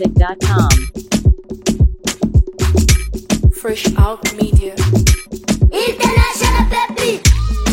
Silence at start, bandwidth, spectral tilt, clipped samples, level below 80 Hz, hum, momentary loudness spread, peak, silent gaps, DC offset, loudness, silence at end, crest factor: 0 s; 16.5 kHz; -5 dB/octave; under 0.1%; -16 dBFS; none; 5 LU; 0 dBFS; none; under 0.1%; -15 LUFS; 0 s; 14 dB